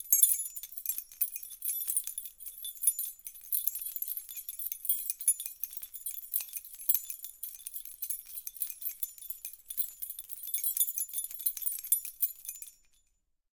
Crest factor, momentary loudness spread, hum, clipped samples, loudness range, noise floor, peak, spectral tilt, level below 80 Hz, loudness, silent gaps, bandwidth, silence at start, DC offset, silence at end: 30 dB; 12 LU; none; under 0.1%; 3 LU; -75 dBFS; -6 dBFS; 4.5 dB/octave; -74 dBFS; -32 LUFS; none; 19 kHz; 0 s; under 0.1%; 0.85 s